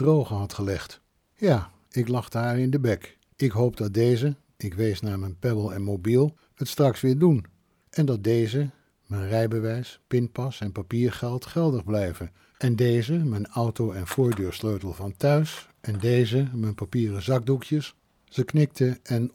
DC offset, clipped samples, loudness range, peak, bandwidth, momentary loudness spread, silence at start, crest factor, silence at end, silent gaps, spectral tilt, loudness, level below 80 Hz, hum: under 0.1%; under 0.1%; 3 LU; -8 dBFS; 16.5 kHz; 10 LU; 0 s; 16 dB; 0.05 s; none; -7.5 dB/octave; -26 LUFS; -54 dBFS; none